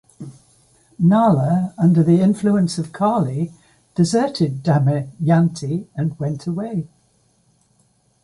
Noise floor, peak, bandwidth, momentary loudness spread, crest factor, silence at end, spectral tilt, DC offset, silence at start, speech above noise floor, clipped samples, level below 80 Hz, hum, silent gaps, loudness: -61 dBFS; -4 dBFS; 11.5 kHz; 13 LU; 16 dB; 1.35 s; -7.5 dB/octave; under 0.1%; 0.2 s; 43 dB; under 0.1%; -58 dBFS; none; none; -19 LUFS